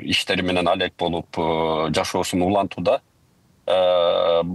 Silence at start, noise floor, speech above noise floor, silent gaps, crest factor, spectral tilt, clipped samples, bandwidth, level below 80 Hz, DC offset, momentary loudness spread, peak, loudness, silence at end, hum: 0 s; -59 dBFS; 38 dB; none; 16 dB; -4.5 dB/octave; under 0.1%; 12.5 kHz; -52 dBFS; under 0.1%; 7 LU; -6 dBFS; -21 LUFS; 0 s; none